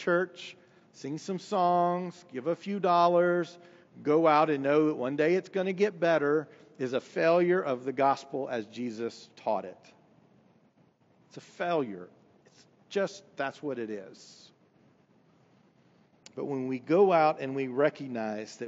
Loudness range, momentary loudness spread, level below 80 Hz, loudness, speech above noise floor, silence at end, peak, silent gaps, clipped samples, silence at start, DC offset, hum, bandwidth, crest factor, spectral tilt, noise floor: 12 LU; 15 LU; -90 dBFS; -29 LUFS; 36 dB; 0 s; -12 dBFS; none; under 0.1%; 0 s; under 0.1%; none; 8 kHz; 18 dB; -5 dB/octave; -65 dBFS